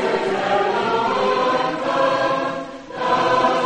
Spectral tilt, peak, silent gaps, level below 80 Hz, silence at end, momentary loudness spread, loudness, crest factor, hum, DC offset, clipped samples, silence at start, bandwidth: -4.5 dB/octave; -6 dBFS; none; -56 dBFS; 0 s; 8 LU; -19 LUFS; 14 dB; none; under 0.1%; under 0.1%; 0 s; 9.8 kHz